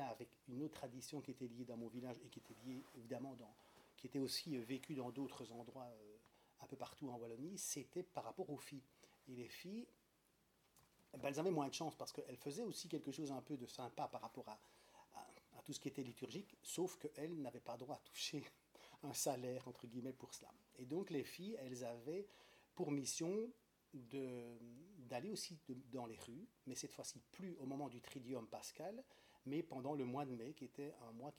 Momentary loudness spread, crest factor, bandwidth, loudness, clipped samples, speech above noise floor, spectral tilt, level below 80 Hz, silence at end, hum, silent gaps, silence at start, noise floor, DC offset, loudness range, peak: 16 LU; 22 dB; 18 kHz; -50 LUFS; under 0.1%; 30 dB; -4.5 dB/octave; -86 dBFS; 0 s; none; none; 0 s; -79 dBFS; under 0.1%; 5 LU; -28 dBFS